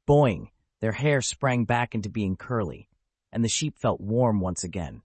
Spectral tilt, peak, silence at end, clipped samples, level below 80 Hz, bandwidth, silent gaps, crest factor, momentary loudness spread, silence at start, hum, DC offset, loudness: -5.5 dB/octave; -8 dBFS; 0.05 s; under 0.1%; -52 dBFS; 8.8 kHz; none; 18 dB; 9 LU; 0.1 s; none; under 0.1%; -26 LUFS